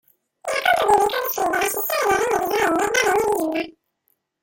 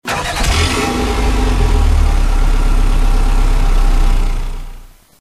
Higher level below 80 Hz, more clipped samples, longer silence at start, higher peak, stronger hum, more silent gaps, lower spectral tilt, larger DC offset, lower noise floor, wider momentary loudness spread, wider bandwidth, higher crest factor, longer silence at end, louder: second, -54 dBFS vs -12 dBFS; neither; first, 0.45 s vs 0.05 s; about the same, -4 dBFS vs -2 dBFS; neither; neither; second, -2 dB/octave vs -4.5 dB/octave; neither; first, -70 dBFS vs -34 dBFS; about the same, 8 LU vs 7 LU; first, 17 kHz vs 13 kHz; first, 18 dB vs 10 dB; first, 0.7 s vs 0.35 s; second, -20 LUFS vs -16 LUFS